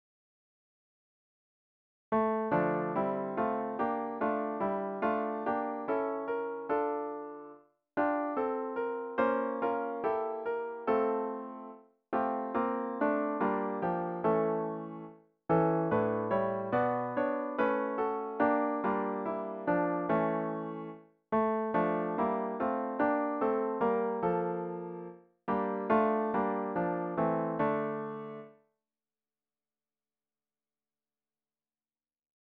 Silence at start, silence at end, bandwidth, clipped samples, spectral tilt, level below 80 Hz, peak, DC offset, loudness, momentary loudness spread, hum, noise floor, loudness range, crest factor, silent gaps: 2.1 s; 3.9 s; 4.6 kHz; under 0.1%; -6.5 dB/octave; -70 dBFS; -14 dBFS; under 0.1%; -32 LUFS; 10 LU; none; under -90 dBFS; 3 LU; 20 dB; none